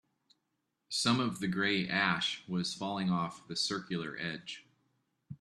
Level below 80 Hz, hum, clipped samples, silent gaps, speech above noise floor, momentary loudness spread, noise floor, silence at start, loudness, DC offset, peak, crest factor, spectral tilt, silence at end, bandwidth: -72 dBFS; none; under 0.1%; none; 49 dB; 10 LU; -83 dBFS; 0.9 s; -33 LUFS; under 0.1%; -14 dBFS; 22 dB; -4 dB/octave; 0.05 s; 12.5 kHz